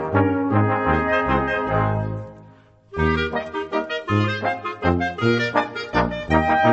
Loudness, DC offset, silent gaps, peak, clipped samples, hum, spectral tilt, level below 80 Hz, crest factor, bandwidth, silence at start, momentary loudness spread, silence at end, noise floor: -21 LUFS; under 0.1%; none; -2 dBFS; under 0.1%; none; -7.5 dB/octave; -38 dBFS; 18 dB; 8 kHz; 0 s; 7 LU; 0 s; -49 dBFS